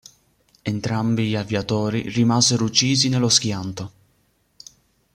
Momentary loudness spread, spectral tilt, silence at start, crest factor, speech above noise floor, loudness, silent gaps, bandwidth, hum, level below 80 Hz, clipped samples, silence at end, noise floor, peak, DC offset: 14 LU; -4 dB/octave; 0.65 s; 22 dB; 44 dB; -20 LUFS; none; 15.5 kHz; none; -56 dBFS; under 0.1%; 1.25 s; -64 dBFS; 0 dBFS; under 0.1%